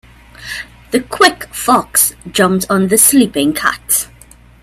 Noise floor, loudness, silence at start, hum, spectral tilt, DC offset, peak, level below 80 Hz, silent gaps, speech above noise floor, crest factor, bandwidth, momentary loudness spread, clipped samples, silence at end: -42 dBFS; -12 LUFS; 0.4 s; 60 Hz at -45 dBFS; -3 dB/octave; under 0.1%; 0 dBFS; -44 dBFS; none; 29 dB; 14 dB; over 20 kHz; 17 LU; under 0.1%; 0.6 s